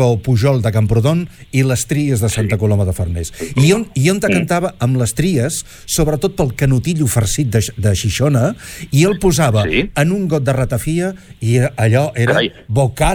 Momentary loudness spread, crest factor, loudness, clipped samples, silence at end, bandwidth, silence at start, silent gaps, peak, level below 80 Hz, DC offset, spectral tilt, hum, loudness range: 6 LU; 12 dB; -15 LUFS; under 0.1%; 0 s; 19 kHz; 0 s; none; -2 dBFS; -32 dBFS; under 0.1%; -5.5 dB/octave; none; 1 LU